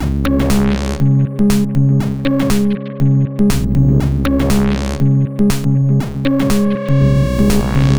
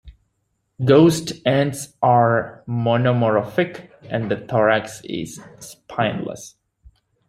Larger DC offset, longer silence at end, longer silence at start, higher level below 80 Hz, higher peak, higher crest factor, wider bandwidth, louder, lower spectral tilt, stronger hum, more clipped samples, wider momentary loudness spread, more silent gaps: neither; second, 0 s vs 0.8 s; about the same, 0 s vs 0.05 s; first, -24 dBFS vs -54 dBFS; about the same, -2 dBFS vs -2 dBFS; second, 12 dB vs 18 dB; first, over 20 kHz vs 15.5 kHz; first, -14 LUFS vs -19 LUFS; about the same, -7 dB/octave vs -6 dB/octave; neither; neither; second, 3 LU vs 17 LU; neither